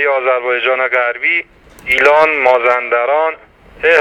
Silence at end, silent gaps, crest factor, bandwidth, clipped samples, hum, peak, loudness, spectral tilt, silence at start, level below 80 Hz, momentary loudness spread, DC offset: 0 s; none; 14 dB; 19.5 kHz; under 0.1%; none; 0 dBFS; -12 LUFS; -3 dB/octave; 0 s; -48 dBFS; 8 LU; under 0.1%